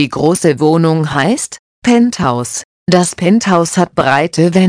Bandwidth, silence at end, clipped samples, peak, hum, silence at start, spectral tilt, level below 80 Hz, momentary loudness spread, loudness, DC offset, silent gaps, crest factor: 10.5 kHz; 0 s; under 0.1%; 0 dBFS; none; 0 s; -5.5 dB/octave; -46 dBFS; 7 LU; -12 LUFS; under 0.1%; 1.59-1.82 s, 2.64-2.86 s; 12 dB